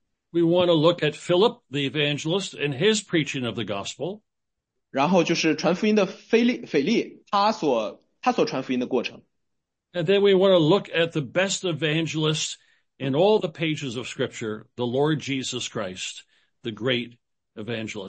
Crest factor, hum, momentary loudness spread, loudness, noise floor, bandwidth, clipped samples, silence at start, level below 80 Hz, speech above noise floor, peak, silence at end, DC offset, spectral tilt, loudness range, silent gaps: 18 dB; none; 13 LU; -24 LUFS; -82 dBFS; 8.8 kHz; under 0.1%; 0.35 s; -70 dBFS; 59 dB; -6 dBFS; 0 s; under 0.1%; -5 dB/octave; 6 LU; none